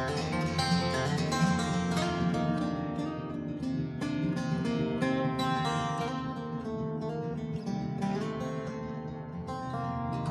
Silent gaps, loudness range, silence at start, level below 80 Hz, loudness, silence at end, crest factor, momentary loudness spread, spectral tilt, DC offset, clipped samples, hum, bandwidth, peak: none; 5 LU; 0 s; -54 dBFS; -32 LUFS; 0 s; 16 dB; 8 LU; -6 dB/octave; under 0.1%; under 0.1%; none; 12.5 kHz; -16 dBFS